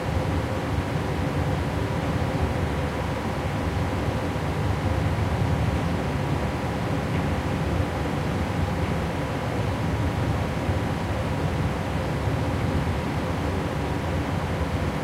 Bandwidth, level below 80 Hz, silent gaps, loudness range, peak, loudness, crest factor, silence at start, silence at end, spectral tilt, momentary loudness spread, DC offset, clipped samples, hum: 16 kHz; -36 dBFS; none; 1 LU; -12 dBFS; -26 LUFS; 14 dB; 0 s; 0 s; -7 dB/octave; 2 LU; under 0.1%; under 0.1%; none